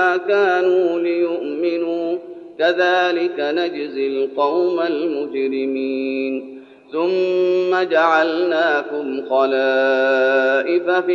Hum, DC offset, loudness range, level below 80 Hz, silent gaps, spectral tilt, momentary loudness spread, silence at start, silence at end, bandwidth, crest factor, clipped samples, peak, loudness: none; under 0.1%; 4 LU; -74 dBFS; none; -5 dB/octave; 8 LU; 0 s; 0 s; 7 kHz; 16 dB; under 0.1%; -2 dBFS; -18 LUFS